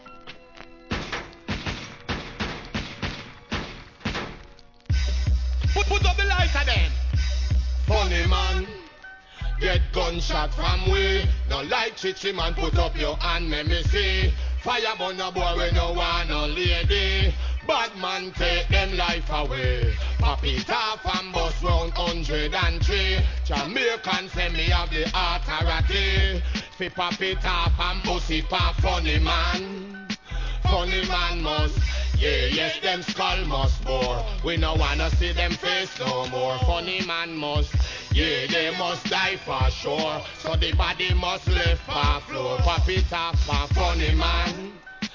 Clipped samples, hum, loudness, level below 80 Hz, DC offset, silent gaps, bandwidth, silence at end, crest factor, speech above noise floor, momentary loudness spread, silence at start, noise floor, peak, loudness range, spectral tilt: under 0.1%; none; -24 LUFS; -26 dBFS; under 0.1%; none; 7.4 kHz; 0 s; 16 dB; 24 dB; 10 LU; 0.05 s; -47 dBFS; -8 dBFS; 2 LU; -5 dB/octave